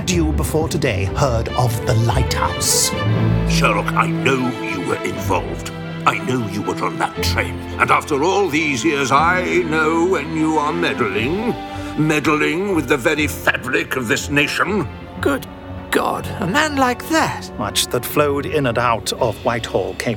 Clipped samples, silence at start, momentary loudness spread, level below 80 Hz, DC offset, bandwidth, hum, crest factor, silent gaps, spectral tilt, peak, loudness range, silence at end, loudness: under 0.1%; 0 s; 6 LU; -34 dBFS; under 0.1%; 19.5 kHz; none; 18 dB; none; -4.5 dB/octave; -2 dBFS; 3 LU; 0 s; -18 LUFS